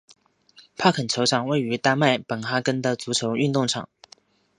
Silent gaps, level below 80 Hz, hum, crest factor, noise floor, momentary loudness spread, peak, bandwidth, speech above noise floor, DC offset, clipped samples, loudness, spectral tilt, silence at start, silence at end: none; -66 dBFS; none; 22 dB; -55 dBFS; 5 LU; -2 dBFS; 11.5 kHz; 33 dB; under 0.1%; under 0.1%; -23 LUFS; -4.5 dB/octave; 0.8 s; 0.75 s